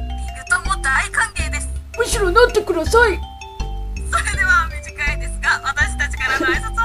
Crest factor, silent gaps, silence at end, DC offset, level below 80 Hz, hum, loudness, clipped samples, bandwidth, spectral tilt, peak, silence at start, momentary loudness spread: 18 dB; none; 0 s; under 0.1%; -26 dBFS; 50 Hz at -35 dBFS; -18 LUFS; under 0.1%; 15.5 kHz; -3.5 dB/octave; 0 dBFS; 0 s; 14 LU